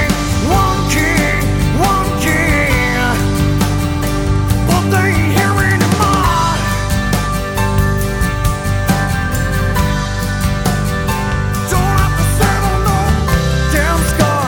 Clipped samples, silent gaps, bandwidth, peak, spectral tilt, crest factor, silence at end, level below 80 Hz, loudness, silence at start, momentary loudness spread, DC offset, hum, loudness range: under 0.1%; none; 20 kHz; 0 dBFS; -5 dB/octave; 14 dB; 0 s; -20 dBFS; -14 LUFS; 0 s; 4 LU; under 0.1%; none; 3 LU